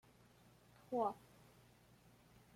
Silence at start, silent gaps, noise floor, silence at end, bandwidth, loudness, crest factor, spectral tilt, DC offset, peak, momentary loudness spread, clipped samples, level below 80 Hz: 0.9 s; none; -68 dBFS; 1.35 s; 16.5 kHz; -43 LUFS; 22 dB; -6.5 dB/octave; under 0.1%; -28 dBFS; 26 LU; under 0.1%; -78 dBFS